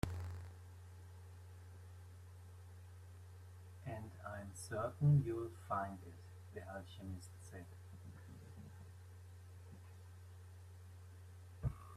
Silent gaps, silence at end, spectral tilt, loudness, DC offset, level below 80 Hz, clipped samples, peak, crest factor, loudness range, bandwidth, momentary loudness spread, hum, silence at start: none; 0 s; -7.5 dB/octave; -44 LUFS; under 0.1%; -64 dBFS; under 0.1%; -20 dBFS; 26 dB; 16 LU; 13.5 kHz; 15 LU; none; 0.05 s